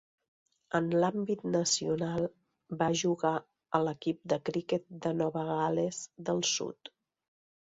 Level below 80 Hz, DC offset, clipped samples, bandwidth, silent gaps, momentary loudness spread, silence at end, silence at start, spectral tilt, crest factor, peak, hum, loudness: -70 dBFS; under 0.1%; under 0.1%; 8 kHz; none; 8 LU; 0.75 s; 0.75 s; -4.5 dB/octave; 22 dB; -12 dBFS; none; -32 LUFS